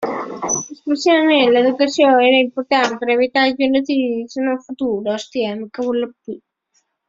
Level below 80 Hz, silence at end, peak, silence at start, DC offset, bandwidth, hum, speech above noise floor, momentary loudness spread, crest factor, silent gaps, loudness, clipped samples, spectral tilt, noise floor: -62 dBFS; 0.7 s; -2 dBFS; 0 s; under 0.1%; 7.8 kHz; none; 49 dB; 11 LU; 16 dB; none; -17 LUFS; under 0.1%; -3 dB/octave; -66 dBFS